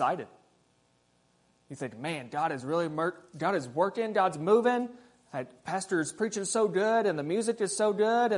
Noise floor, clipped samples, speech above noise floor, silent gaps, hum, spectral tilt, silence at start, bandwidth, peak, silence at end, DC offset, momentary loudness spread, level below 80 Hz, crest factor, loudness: -69 dBFS; under 0.1%; 40 dB; none; 60 Hz at -65 dBFS; -4.5 dB/octave; 0 s; 11 kHz; -12 dBFS; 0 s; under 0.1%; 14 LU; -78 dBFS; 18 dB; -29 LUFS